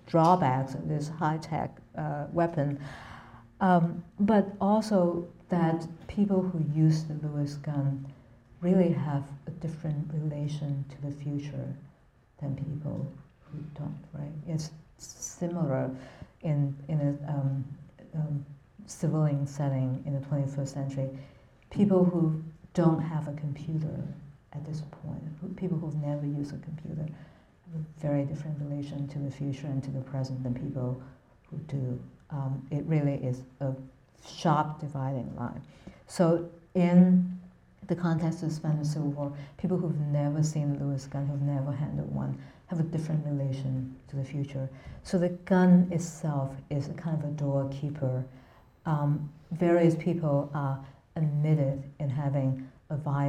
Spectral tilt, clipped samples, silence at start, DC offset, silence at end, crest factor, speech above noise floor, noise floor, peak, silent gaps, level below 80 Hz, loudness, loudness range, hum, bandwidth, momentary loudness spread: -8 dB/octave; under 0.1%; 0.05 s; under 0.1%; 0 s; 22 dB; 32 dB; -61 dBFS; -8 dBFS; none; -60 dBFS; -30 LUFS; 8 LU; none; 11 kHz; 15 LU